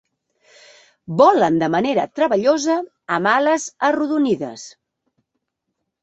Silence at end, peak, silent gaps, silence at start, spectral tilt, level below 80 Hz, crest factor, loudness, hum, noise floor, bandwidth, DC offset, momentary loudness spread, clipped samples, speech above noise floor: 1.35 s; 0 dBFS; none; 1.1 s; -5 dB/octave; -64 dBFS; 18 dB; -18 LUFS; none; -77 dBFS; 8.2 kHz; under 0.1%; 10 LU; under 0.1%; 60 dB